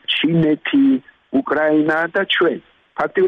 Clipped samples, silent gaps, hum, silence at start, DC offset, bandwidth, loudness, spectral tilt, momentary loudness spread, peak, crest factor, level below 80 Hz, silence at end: under 0.1%; none; none; 0.1 s; under 0.1%; 4.9 kHz; -17 LUFS; -7.5 dB/octave; 7 LU; -8 dBFS; 10 dB; -58 dBFS; 0 s